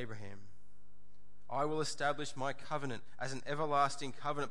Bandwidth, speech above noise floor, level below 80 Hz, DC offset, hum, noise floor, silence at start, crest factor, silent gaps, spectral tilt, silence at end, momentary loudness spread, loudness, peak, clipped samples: 11.5 kHz; 31 dB; -72 dBFS; 1%; none; -69 dBFS; 0 s; 20 dB; none; -4.5 dB/octave; 0 s; 13 LU; -38 LUFS; -18 dBFS; under 0.1%